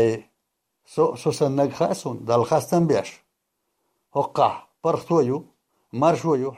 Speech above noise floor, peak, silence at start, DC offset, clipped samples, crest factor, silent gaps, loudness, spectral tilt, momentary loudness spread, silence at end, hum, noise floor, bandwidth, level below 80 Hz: 56 dB; -4 dBFS; 0 s; under 0.1%; under 0.1%; 18 dB; none; -23 LUFS; -6.5 dB/octave; 9 LU; 0 s; none; -77 dBFS; 15 kHz; -64 dBFS